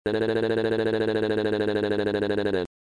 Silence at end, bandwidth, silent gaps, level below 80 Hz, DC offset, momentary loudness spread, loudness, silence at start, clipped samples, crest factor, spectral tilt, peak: 0.3 s; 10.5 kHz; none; -54 dBFS; under 0.1%; 1 LU; -25 LUFS; 0.05 s; under 0.1%; 12 dB; -7 dB/octave; -12 dBFS